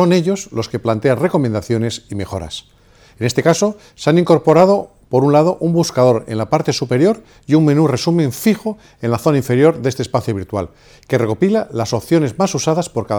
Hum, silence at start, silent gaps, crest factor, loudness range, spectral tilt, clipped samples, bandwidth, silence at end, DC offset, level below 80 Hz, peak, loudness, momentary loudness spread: none; 0 s; none; 16 dB; 4 LU; -6 dB/octave; under 0.1%; 20 kHz; 0 s; under 0.1%; -50 dBFS; 0 dBFS; -16 LUFS; 11 LU